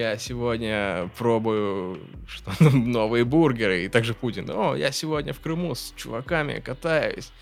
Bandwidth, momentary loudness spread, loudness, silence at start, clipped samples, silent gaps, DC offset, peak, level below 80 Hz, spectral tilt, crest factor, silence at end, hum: 16 kHz; 13 LU; -24 LUFS; 0 s; under 0.1%; none; under 0.1%; -2 dBFS; -46 dBFS; -6 dB/octave; 22 dB; 0.1 s; none